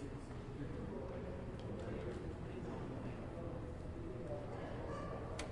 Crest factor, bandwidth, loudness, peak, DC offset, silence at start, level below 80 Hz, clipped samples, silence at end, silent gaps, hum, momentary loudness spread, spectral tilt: 16 dB; 11 kHz; -47 LUFS; -30 dBFS; under 0.1%; 0 s; -54 dBFS; under 0.1%; 0 s; none; none; 2 LU; -7 dB/octave